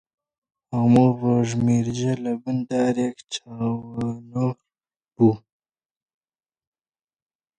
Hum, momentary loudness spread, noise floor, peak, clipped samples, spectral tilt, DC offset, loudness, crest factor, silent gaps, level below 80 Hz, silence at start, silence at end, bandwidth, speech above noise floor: none; 12 LU; under -90 dBFS; -4 dBFS; under 0.1%; -7.5 dB/octave; under 0.1%; -23 LUFS; 20 dB; none; -58 dBFS; 0.7 s; 2.2 s; 9.6 kHz; over 69 dB